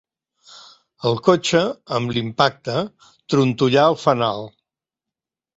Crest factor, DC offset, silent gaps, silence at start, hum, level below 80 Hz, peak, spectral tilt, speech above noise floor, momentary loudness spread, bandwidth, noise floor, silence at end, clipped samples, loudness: 20 dB; under 0.1%; none; 0.5 s; none; -58 dBFS; 0 dBFS; -5.5 dB/octave; 69 dB; 10 LU; 8 kHz; -87 dBFS; 1.1 s; under 0.1%; -19 LUFS